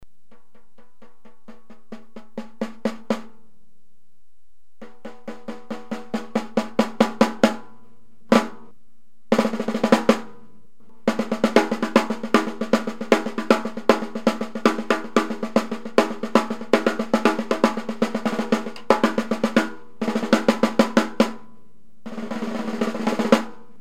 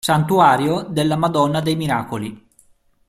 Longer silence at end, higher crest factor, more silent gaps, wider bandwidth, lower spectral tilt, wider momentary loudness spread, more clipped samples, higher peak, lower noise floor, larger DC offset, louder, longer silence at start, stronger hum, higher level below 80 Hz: second, 0.25 s vs 0.7 s; first, 24 dB vs 18 dB; neither; about the same, 15 kHz vs 15 kHz; about the same, -5 dB/octave vs -6 dB/octave; first, 16 LU vs 13 LU; neither; about the same, 0 dBFS vs -2 dBFS; first, -65 dBFS vs -55 dBFS; first, 2% vs under 0.1%; second, -22 LUFS vs -18 LUFS; about the same, 0 s vs 0.05 s; neither; second, -64 dBFS vs -52 dBFS